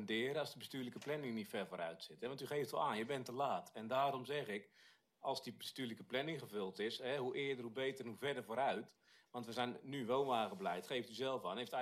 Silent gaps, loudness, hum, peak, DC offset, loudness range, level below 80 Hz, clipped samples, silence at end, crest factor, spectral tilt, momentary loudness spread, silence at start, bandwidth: none; -43 LUFS; none; -24 dBFS; under 0.1%; 2 LU; -88 dBFS; under 0.1%; 0 s; 18 dB; -4.5 dB/octave; 8 LU; 0 s; 15.5 kHz